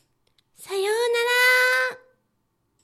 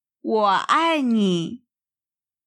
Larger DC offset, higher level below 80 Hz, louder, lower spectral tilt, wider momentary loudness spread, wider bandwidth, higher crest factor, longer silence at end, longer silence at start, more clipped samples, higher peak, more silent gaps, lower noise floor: neither; about the same, -78 dBFS vs -80 dBFS; about the same, -20 LUFS vs -20 LUFS; second, 0.5 dB/octave vs -5.5 dB/octave; first, 11 LU vs 7 LU; first, 15.5 kHz vs 11 kHz; about the same, 16 dB vs 18 dB; about the same, 0.85 s vs 0.9 s; first, 0.6 s vs 0.25 s; neither; second, -8 dBFS vs -4 dBFS; neither; second, -72 dBFS vs under -90 dBFS